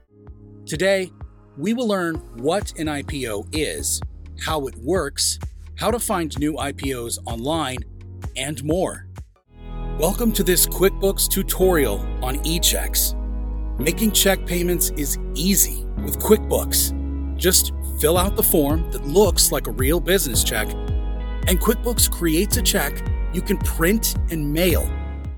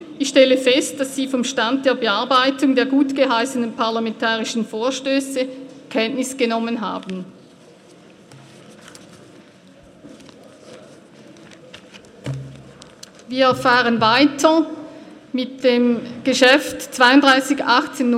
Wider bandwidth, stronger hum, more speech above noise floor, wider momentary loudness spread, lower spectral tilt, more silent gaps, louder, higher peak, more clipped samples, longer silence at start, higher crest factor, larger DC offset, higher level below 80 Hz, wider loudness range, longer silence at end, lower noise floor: first, 19 kHz vs 15.5 kHz; neither; second, 23 dB vs 29 dB; second, 11 LU vs 15 LU; about the same, -3.5 dB/octave vs -3.5 dB/octave; neither; second, -21 LUFS vs -17 LUFS; about the same, 0 dBFS vs 0 dBFS; neither; first, 0.25 s vs 0 s; about the same, 20 dB vs 20 dB; neither; first, -28 dBFS vs -62 dBFS; second, 6 LU vs 20 LU; about the same, 0 s vs 0 s; second, -43 dBFS vs -47 dBFS